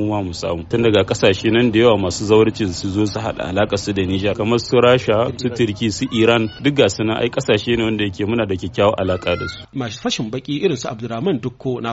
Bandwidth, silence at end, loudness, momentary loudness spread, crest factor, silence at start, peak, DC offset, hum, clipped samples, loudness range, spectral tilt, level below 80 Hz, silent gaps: 8 kHz; 0 s; -18 LUFS; 9 LU; 16 dB; 0 s; -2 dBFS; under 0.1%; none; under 0.1%; 4 LU; -4.5 dB/octave; -44 dBFS; none